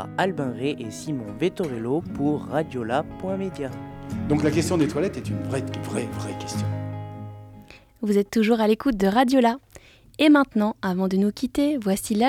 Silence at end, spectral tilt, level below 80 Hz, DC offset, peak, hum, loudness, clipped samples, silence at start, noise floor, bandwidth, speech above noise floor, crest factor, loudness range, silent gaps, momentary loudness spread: 0 s; -6 dB/octave; -52 dBFS; under 0.1%; -6 dBFS; none; -24 LUFS; under 0.1%; 0 s; -50 dBFS; 16 kHz; 27 dB; 18 dB; 6 LU; none; 14 LU